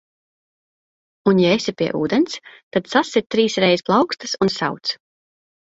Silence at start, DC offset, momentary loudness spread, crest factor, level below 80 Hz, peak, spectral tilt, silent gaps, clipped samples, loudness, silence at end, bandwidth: 1.25 s; under 0.1%; 9 LU; 18 dB; -60 dBFS; -2 dBFS; -5 dB/octave; 2.63-2.71 s; under 0.1%; -19 LUFS; 0.8 s; 8 kHz